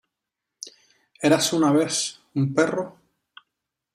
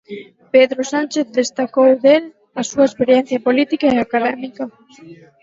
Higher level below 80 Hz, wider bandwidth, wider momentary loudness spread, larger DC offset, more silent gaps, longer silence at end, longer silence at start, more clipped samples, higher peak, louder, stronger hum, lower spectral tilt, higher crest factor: second, -68 dBFS vs -58 dBFS; first, 15 kHz vs 7.8 kHz; first, 21 LU vs 16 LU; neither; neither; first, 1.05 s vs 0.3 s; first, 0.65 s vs 0.1 s; neither; second, -4 dBFS vs 0 dBFS; second, -22 LUFS vs -16 LUFS; neither; about the same, -4.5 dB/octave vs -4 dB/octave; about the same, 20 dB vs 16 dB